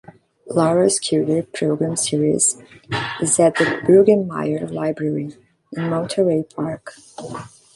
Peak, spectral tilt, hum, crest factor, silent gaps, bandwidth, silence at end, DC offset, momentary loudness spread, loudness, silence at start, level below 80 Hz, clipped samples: -2 dBFS; -4.5 dB/octave; none; 18 dB; none; 11.5 kHz; 0.3 s; under 0.1%; 18 LU; -19 LUFS; 0.45 s; -58 dBFS; under 0.1%